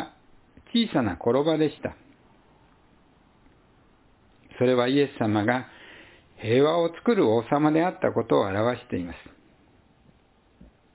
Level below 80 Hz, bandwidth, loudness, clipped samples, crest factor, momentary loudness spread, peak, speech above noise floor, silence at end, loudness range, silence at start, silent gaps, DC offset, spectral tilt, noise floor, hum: -58 dBFS; 4 kHz; -24 LUFS; under 0.1%; 20 dB; 15 LU; -8 dBFS; 37 dB; 1.75 s; 6 LU; 0 s; none; under 0.1%; -10.5 dB/octave; -61 dBFS; none